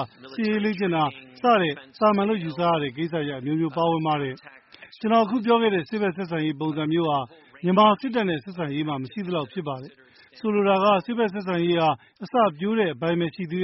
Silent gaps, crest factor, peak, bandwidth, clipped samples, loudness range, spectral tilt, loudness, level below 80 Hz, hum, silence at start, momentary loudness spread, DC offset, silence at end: none; 18 dB; -6 dBFS; 5.8 kHz; under 0.1%; 2 LU; -4.5 dB/octave; -24 LUFS; -66 dBFS; none; 0 s; 10 LU; under 0.1%; 0 s